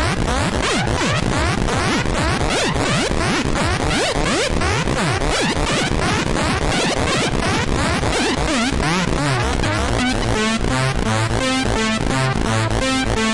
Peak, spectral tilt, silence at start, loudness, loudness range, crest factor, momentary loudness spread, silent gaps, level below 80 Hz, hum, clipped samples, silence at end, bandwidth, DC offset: -6 dBFS; -4.5 dB/octave; 0 s; -18 LUFS; 0 LU; 12 dB; 1 LU; none; -28 dBFS; none; under 0.1%; 0 s; 11.5 kHz; under 0.1%